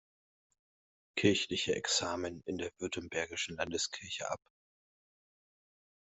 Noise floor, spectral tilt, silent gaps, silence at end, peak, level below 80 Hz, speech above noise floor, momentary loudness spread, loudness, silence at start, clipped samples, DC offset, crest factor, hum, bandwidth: under -90 dBFS; -3 dB/octave; none; 1.65 s; -12 dBFS; -70 dBFS; over 54 dB; 10 LU; -35 LUFS; 1.15 s; under 0.1%; under 0.1%; 26 dB; none; 8.2 kHz